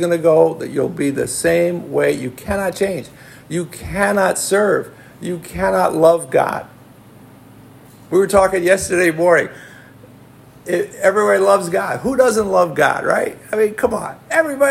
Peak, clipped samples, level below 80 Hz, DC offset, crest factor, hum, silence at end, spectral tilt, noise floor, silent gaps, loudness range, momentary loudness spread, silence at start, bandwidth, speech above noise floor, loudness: 0 dBFS; under 0.1%; -48 dBFS; under 0.1%; 16 dB; none; 0 s; -4.5 dB/octave; -43 dBFS; none; 3 LU; 12 LU; 0 s; 16.5 kHz; 27 dB; -16 LUFS